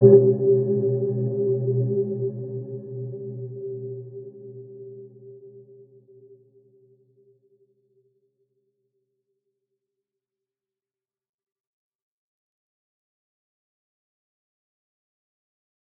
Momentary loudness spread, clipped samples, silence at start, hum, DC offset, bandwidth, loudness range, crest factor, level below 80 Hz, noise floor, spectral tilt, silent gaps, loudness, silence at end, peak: 22 LU; under 0.1%; 0 s; none; under 0.1%; 1.8 kHz; 23 LU; 26 dB; -84 dBFS; under -90 dBFS; -16.5 dB/octave; none; -24 LUFS; 10.35 s; -2 dBFS